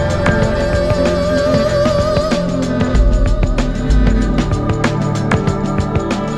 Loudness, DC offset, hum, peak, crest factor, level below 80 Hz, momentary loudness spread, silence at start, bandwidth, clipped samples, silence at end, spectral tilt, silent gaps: -15 LUFS; under 0.1%; none; 0 dBFS; 14 dB; -18 dBFS; 3 LU; 0 s; 11.5 kHz; under 0.1%; 0 s; -6.5 dB/octave; none